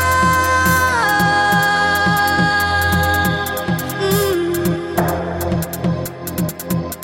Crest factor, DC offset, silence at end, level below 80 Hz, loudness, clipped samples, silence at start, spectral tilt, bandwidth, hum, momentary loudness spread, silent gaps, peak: 14 dB; under 0.1%; 0 s; -36 dBFS; -16 LUFS; under 0.1%; 0 s; -4.5 dB/octave; 17 kHz; none; 8 LU; none; -2 dBFS